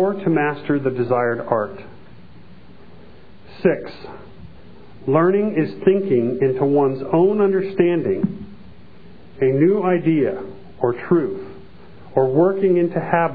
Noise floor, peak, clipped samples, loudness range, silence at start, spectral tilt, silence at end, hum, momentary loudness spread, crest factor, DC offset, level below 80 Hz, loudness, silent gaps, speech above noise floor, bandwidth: -45 dBFS; -2 dBFS; under 0.1%; 7 LU; 0 s; -11.5 dB/octave; 0 s; none; 15 LU; 18 dB; 1%; -54 dBFS; -19 LUFS; none; 27 dB; 4.9 kHz